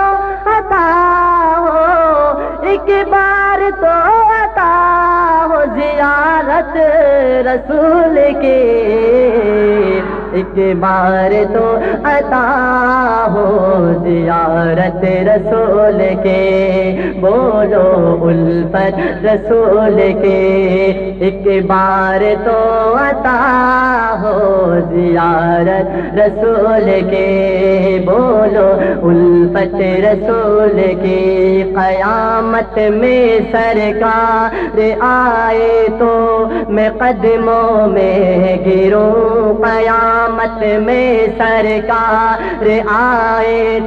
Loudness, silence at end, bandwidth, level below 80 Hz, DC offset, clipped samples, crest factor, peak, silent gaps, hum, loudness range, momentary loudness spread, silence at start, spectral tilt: -11 LUFS; 0 s; 6.4 kHz; -32 dBFS; under 0.1%; under 0.1%; 10 dB; -2 dBFS; none; none; 1 LU; 4 LU; 0 s; -8.5 dB/octave